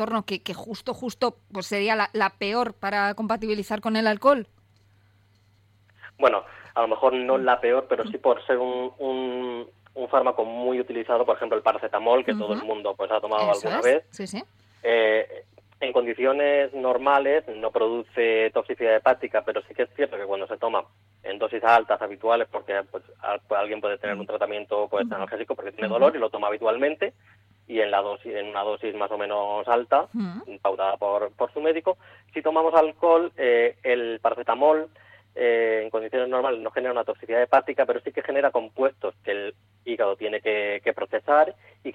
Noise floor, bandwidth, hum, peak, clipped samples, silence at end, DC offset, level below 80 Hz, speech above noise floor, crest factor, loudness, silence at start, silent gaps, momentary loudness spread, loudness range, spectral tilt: -61 dBFS; 13 kHz; none; -6 dBFS; under 0.1%; 0 s; under 0.1%; -68 dBFS; 36 dB; 20 dB; -24 LUFS; 0 s; none; 10 LU; 4 LU; -5 dB/octave